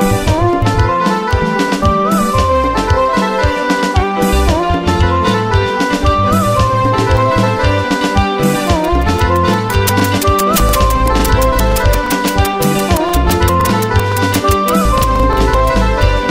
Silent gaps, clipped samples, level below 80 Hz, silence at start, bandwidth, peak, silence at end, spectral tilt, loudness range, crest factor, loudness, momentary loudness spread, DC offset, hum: none; under 0.1%; -18 dBFS; 0 s; 16.5 kHz; 0 dBFS; 0 s; -5.5 dB/octave; 1 LU; 12 dB; -13 LUFS; 2 LU; under 0.1%; none